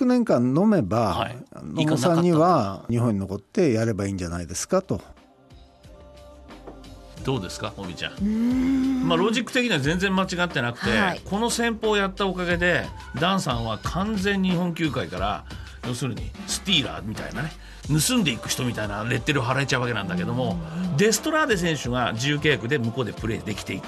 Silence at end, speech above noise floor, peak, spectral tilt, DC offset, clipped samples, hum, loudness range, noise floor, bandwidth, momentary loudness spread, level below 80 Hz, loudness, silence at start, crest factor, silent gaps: 0 s; 27 dB; -6 dBFS; -5 dB/octave; under 0.1%; under 0.1%; none; 6 LU; -50 dBFS; 13 kHz; 12 LU; -44 dBFS; -24 LUFS; 0 s; 18 dB; none